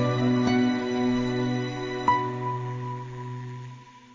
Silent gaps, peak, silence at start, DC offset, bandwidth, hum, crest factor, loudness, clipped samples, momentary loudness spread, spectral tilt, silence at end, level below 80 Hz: none; -10 dBFS; 0 s; under 0.1%; 7.6 kHz; none; 18 dB; -27 LUFS; under 0.1%; 15 LU; -7 dB/octave; 0 s; -56 dBFS